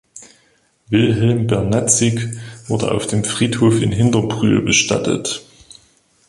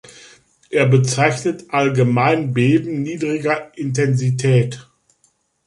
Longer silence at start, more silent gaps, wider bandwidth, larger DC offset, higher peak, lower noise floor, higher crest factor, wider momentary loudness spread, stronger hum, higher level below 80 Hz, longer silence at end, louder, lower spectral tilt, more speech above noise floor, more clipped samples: second, 0.15 s vs 0.7 s; neither; about the same, 11.5 kHz vs 11.5 kHz; neither; about the same, 0 dBFS vs -2 dBFS; second, -58 dBFS vs -62 dBFS; about the same, 16 dB vs 16 dB; about the same, 10 LU vs 8 LU; neither; first, -44 dBFS vs -58 dBFS; about the same, 0.9 s vs 0.85 s; about the same, -16 LUFS vs -18 LUFS; second, -4.5 dB/octave vs -6 dB/octave; second, 42 dB vs 46 dB; neither